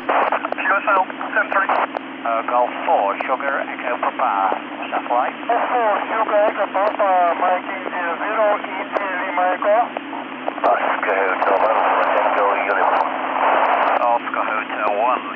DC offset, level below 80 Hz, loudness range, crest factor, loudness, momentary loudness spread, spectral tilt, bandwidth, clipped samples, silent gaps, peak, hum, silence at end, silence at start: under 0.1%; -72 dBFS; 3 LU; 14 dB; -19 LUFS; 6 LU; -6 dB/octave; 5.4 kHz; under 0.1%; none; -6 dBFS; none; 0 s; 0 s